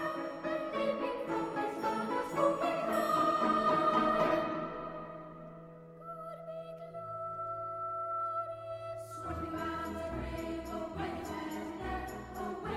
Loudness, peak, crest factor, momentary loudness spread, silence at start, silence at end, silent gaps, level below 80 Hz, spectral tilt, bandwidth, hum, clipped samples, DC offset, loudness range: -35 LUFS; -18 dBFS; 18 dB; 16 LU; 0 s; 0 s; none; -56 dBFS; -6 dB/octave; 16 kHz; none; under 0.1%; under 0.1%; 10 LU